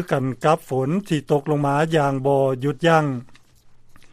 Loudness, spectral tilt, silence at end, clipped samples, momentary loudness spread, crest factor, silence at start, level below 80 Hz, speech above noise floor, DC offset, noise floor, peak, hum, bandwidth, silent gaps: -20 LUFS; -7 dB/octave; 0.05 s; under 0.1%; 6 LU; 18 dB; 0 s; -56 dBFS; 28 dB; under 0.1%; -48 dBFS; -2 dBFS; none; 15 kHz; none